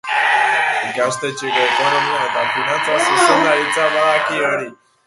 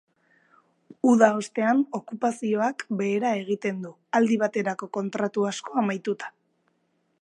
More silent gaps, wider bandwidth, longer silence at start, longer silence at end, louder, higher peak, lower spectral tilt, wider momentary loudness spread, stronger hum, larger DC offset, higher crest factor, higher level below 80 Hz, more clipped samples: neither; about the same, 11.5 kHz vs 11 kHz; second, 0.05 s vs 1.05 s; second, 0.35 s vs 0.95 s; first, -15 LUFS vs -25 LUFS; about the same, 0 dBFS vs -2 dBFS; second, -2.5 dB/octave vs -5.5 dB/octave; second, 6 LU vs 10 LU; neither; neither; second, 16 dB vs 22 dB; first, -66 dBFS vs -80 dBFS; neither